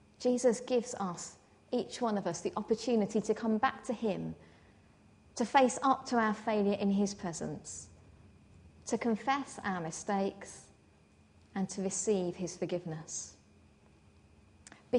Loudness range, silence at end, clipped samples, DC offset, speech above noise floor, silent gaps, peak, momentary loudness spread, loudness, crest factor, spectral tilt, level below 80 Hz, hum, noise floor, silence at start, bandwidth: 6 LU; 0 s; under 0.1%; under 0.1%; 31 dB; none; -12 dBFS; 14 LU; -34 LUFS; 22 dB; -5 dB/octave; -68 dBFS; none; -63 dBFS; 0.2 s; 10.5 kHz